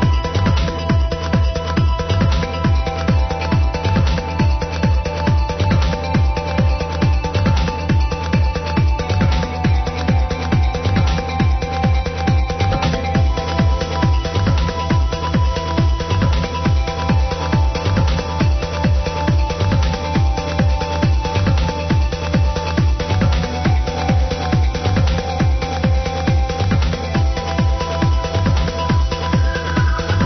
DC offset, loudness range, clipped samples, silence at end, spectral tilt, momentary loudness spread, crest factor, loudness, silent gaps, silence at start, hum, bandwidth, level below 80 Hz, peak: under 0.1%; 0 LU; under 0.1%; 0 s; -6.5 dB/octave; 2 LU; 12 dB; -18 LUFS; none; 0 s; none; 6.4 kHz; -20 dBFS; -4 dBFS